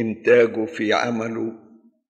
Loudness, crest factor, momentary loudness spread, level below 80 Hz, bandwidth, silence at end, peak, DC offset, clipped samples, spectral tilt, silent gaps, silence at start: -20 LUFS; 16 dB; 12 LU; -72 dBFS; 8 kHz; 0.6 s; -4 dBFS; under 0.1%; under 0.1%; -5.5 dB/octave; none; 0 s